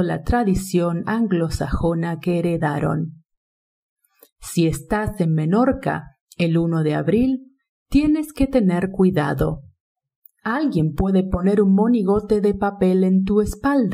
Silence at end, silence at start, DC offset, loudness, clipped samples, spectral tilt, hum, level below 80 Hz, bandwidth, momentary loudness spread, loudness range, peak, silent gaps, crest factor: 0 s; 0 s; under 0.1%; -20 LUFS; under 0.1%; -7.5 dB/octave; none; -36 dBFS; 16 kHz; 7 LU; 5 LU; -6 dBFS; 3.37-3.96 s, 4.32-4.36 s, 6.21-6.27 s, 7.69-7.86 s, 9.80-9.95 s, 10.16-10.22 s; 14 dB